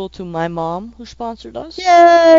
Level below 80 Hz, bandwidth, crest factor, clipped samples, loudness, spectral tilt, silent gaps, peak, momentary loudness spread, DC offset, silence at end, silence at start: -46 dBFS; 7.6 kHz; 14 dB; under 0.1%; -13 LUFS; -5 dB/octave; none; 0 dBFS; 21 LU; under 0.1%; 0 s; 0 s